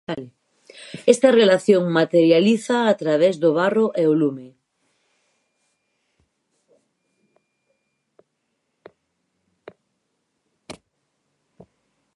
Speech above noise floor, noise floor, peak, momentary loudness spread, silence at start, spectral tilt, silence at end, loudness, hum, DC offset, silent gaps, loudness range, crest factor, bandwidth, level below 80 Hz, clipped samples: 57 dB; -74 dBFS; 0 dBFS; 10 LU; 0.1 s; -5.5 dB/octave; 1.45 s; -18 LUFS; none; under 0.1%; none; 9 LU; 22 dB; 11.5 kHz; -72 dBFS; under 0.1%